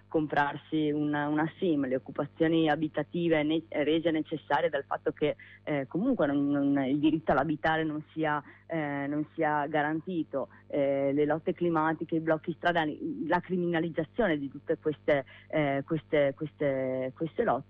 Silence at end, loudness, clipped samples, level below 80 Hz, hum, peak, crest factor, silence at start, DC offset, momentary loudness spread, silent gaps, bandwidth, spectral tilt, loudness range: 0.05 s; -30 LUFS; under 0.1%; -62 dBFS; none; -16 dBFS; 14 dB; 0.1 s; under 0.1%; 6 LU; none; 5.4 kHz; -9 dB/octave; 2 LU